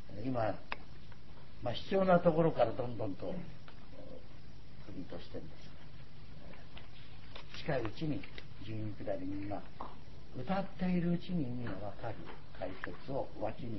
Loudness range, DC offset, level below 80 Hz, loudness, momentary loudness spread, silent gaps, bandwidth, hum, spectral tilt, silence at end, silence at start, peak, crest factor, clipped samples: 17 LU; 1%; -58 dBFS; -37 LUFS; 22 LU; none; 6 kHz; none; -6 dB/octave; 0 s; 0 s; -14 dBFS; 24 dB; under 0.1%